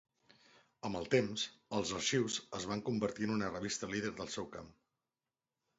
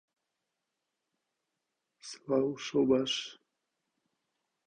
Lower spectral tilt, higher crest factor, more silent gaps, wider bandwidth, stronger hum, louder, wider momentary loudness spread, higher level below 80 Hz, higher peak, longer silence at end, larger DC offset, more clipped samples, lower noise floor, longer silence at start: about the same, -4 dB/octave vs -4.5 dB/octave; about the same, 22 dB vs 22 dB; neither; second, 8 kHz vs 9.6 kHz; neither; second, -38 LUFS vs -31 LUFS; second, 9 LU vs 19 LU; first, -68 dBFS vs -74 dBFS; second, -18 dBFS vs -14 dBFS; second, 1.1 s vs 1.35 s; neither; neither; first, under -90 dBFS vs -86 dBFS; second, 0.85 s vs 2.05 s